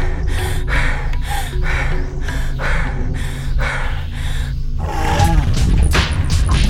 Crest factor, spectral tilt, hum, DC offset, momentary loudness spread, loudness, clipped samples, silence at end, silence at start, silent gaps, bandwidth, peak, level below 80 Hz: 16 dB; -5 dB/octave; none; under 0.1%; 9 LU; -20 LUFS; under 0.1%; 0 s; 0 s; none; 14.5 kHz; 0 dBFS; -18 dBFS